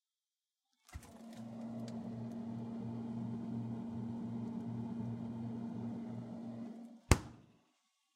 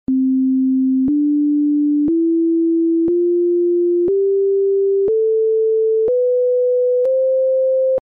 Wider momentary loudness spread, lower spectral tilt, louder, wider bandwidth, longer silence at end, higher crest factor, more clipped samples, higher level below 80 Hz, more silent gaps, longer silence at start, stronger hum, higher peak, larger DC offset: first, 16 LU vs 0 LU; about the same, -6 dB/octave vs -5 dB/octave; second, -42 LUFS vs -16 LUFS; first, 16 kHz vs 1.4 kHz; first, 0.65 s vs 0.05 s; first, 38 dB vs 4 dB; neither; about the same, -52 dBFS vs -56 dBFS; neither; first, 0.9 s vs 0.1 s; neither; first, -4 dBFS vs -12 dBFS; neither